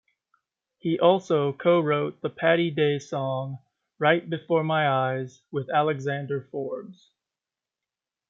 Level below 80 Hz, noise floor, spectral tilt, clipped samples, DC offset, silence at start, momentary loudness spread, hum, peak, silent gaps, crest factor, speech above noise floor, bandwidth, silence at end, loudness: -74 dBFS; -90 dBFS; -7 dB/octave; under 0.1%; under 0.1%; 0.85 s; 12 LU; none; -6 dBFS; none; 20 dB; 65 dB; 7.6 kHz; 1.4 s; -25 LUFS